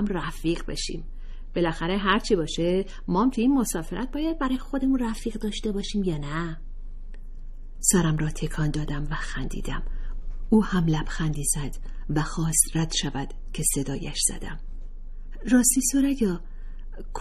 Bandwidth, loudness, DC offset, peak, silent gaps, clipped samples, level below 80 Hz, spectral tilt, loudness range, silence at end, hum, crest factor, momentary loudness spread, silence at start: 14.5 kHz; -26 LUFS; under 0.1%; -4 dBFS; none; under 0.1%; -32 dBFS; -4 dB/octave; 3 LU; 0 s; none; 22 dB; 23 LU; 0 s